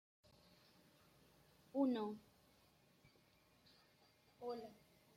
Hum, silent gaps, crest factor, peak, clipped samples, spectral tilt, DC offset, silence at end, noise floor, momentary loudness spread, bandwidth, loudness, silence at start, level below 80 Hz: none; none; 22 dB; -28 dBFS; under 0.1%; -6.5 dB/octave; under 0.1%; 0.45 s; -74 dBFS; 16 LU; 16 kHz; -45 LUFS; 1.75 s; -86 dBFS